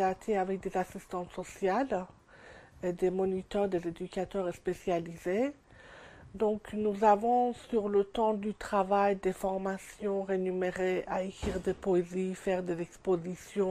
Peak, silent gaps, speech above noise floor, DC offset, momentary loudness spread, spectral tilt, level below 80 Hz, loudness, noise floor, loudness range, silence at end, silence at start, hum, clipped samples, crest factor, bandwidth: -12 dBFS; none; 23 dB; under 0.1%; 10 LU; -6.5 dB/octave; -56 dBFS; -32 LUFS; -54 dBFS; 5 LU; 0 s; 0 s; none; under 0.1%; 20 dB; 15 kHz